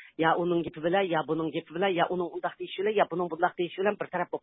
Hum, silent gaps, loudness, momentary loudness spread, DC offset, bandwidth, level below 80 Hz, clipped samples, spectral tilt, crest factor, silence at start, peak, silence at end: none; none; -29 LUFS; 6 LU; under 0.1%; 4 kHz; -68 dBFS; under 0.1%; -10 dB/octave; 20 dB; 0 s; -8 dBFS; 0.05 s